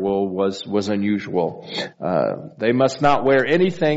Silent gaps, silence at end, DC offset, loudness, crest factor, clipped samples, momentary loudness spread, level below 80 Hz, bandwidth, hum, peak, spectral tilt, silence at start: none; 0 s; under 0.1%; -20 LUFS; 14 dB; under 0.1%; 9 LU; -56 dBFS; 8 kHz; none; -6 dBFS; -4.5 dB/octave; 0 s